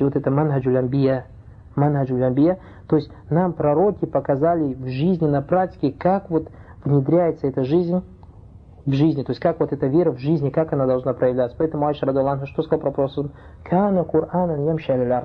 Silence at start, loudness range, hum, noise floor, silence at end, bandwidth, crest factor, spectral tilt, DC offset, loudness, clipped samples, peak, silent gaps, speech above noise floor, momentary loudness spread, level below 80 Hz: 0 s; 1 LU; none; -44 dBFS; 0 s; 5.4 kHz; 14 dB; -11 dB/octave; under 0.1%; -21 LUFS; under 0.1%; -6 dBFS; none; 24 dB; 6 LU; -48 dBFS